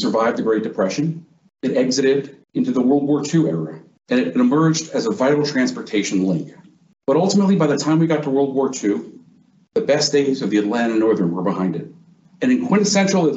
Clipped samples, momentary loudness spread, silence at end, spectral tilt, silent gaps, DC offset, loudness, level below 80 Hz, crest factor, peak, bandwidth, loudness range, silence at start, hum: under 0.1%; 9 LU; 0 s; -5.5 dB/octave; none; under 0.1%; -19 LUFS; -66 dBFS; 14 dB; -4 dBFS; 8.2 kHz; 1 LU; 0 s; none